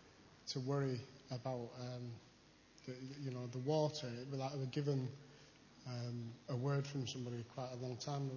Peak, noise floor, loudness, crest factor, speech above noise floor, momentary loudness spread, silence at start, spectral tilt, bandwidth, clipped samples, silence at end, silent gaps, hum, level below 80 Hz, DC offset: -26 dBFS; -66 dBFS; -44 LUFS; 18 dB; 24 dB; 15 LU; 0 s; -6.5 dB/octave; 7.2 kHz; under 0.1%; 0 s; none; none; -78 dBFS; under 0.1%